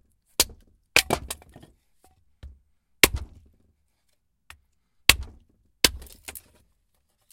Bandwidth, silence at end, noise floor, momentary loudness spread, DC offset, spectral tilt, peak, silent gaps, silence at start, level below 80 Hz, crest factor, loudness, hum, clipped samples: 16.5 kHz; 0.95 s; -72 dBFS; 21 LU; under 0.1%; -1 dB/octave; 0 dBFS; none; 0.4 s; -44 dBFS; 30 dB; -22 LUFS; none; under 0.1%